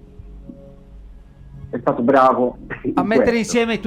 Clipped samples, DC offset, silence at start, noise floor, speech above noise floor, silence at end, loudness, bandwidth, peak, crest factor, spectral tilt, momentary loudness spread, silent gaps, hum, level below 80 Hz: under 0.1%; under 0.1%; 0.2 s; -41 dBFS; 24 dB; 0 s; -17 LUFS; 14.5 kHz; -4 dBFS; 16 dB; -5.5 dB/octave; 10 LU; none; none; -42 dBFS